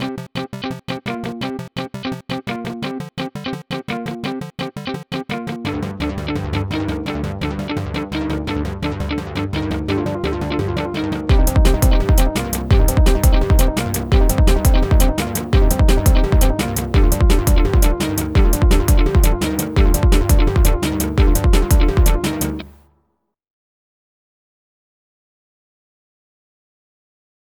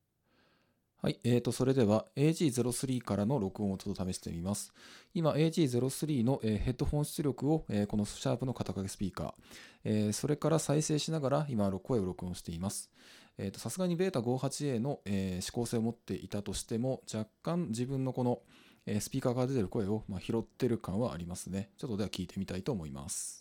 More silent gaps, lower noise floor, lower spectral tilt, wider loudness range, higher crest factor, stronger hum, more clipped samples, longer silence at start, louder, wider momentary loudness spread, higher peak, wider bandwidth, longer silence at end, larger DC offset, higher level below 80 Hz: neither; second, -68 dBFS vs -74 dBFS; about the same, -5.5 dB/octave vs -6 dB/octave; first, 10 LU vs 4 LU; about the same, 16 dB vs 18 dB; neither; neither; second, 0 s vs 1.05 s; first, -18 LUFS vs -34 LUFS; about the same, 11 LU vs 10 LU; first, 0 dBFS vs -16 dBFS; first, 19.5 kHz vs 17.5 kHz; first, 4.9 s vs 0 s; neither; first, -18 dBFS vs -56 dBFS